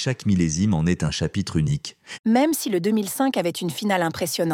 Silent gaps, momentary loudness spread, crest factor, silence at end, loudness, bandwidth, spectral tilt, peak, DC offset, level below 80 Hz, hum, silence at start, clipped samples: 2.19-2.24 s; 6 LU; 14 dB; 0 s; -23 LUFS; 17 kHz; -5.5 dB/octave; -8 dBFS; under 0.1%; -46 dBFS; none; 0 s; under 0.1%